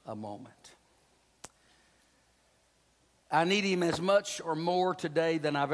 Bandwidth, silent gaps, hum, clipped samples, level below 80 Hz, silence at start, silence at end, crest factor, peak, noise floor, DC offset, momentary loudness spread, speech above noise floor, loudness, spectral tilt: 11 kHz; none; none; under 0.1%; -72 dBFS; 0.05 s; 0 s; 18 dB; -14 dBFS; -69 dBFS; under 0.1%; 25 LU; 39 dB; -30 LUFS; -4.5 dB/octave